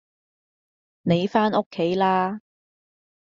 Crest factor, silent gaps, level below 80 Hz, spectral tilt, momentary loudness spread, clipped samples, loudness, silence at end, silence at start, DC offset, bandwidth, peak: 20 dB; 1.66-1.71 s; -64 dBFS; -5 dB/octave; 9 LU; under 0.1%; -23 LUFS; 0.85 s; 1.05 s; under 0.1%; 7.4 kHz; -6 dBFS